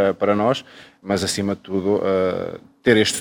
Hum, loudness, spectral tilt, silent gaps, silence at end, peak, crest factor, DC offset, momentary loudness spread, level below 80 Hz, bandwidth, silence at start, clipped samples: none; -21 LUFS; -4.5 dB/octave; none; 0 s; -2 dBFS; 18 dB; under 0.1%; 10 LU; -56 dBFS; over 20 kHz; 0 s; under 0.1%